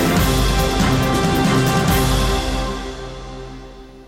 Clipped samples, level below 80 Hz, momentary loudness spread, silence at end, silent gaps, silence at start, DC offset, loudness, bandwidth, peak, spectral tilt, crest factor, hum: under 0.1%; -24 dBFS; 17 LU; 0 s; none; 0 s; under 0.1%; -17 LUFS; 16.5 kHz; -6 dBFS; -5 dB/octave; 12 dB; none